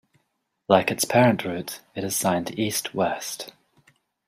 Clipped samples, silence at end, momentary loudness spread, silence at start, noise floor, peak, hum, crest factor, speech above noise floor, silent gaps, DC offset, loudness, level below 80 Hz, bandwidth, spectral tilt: under 0.1%; 0.75 s; 15 LU; 0.7 s; -75 dBFS; -4 dBFS; none; 22 dB; 52 dB; none; under 0.1%; -23 LUFS; -64 dBFS; 16 kHz; -4 dB/octave